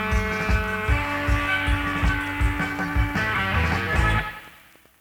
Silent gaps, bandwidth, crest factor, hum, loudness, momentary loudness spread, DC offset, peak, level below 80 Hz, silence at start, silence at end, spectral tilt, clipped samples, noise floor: none; 17 kHz; 16 dB; none; -23 LUFS; 3 LU; under 0.1%; -8 dBFS; -28 dBFS; 0 s; 0.45 s; -5.5 dB/octave; under 0.1%; -52 dBFS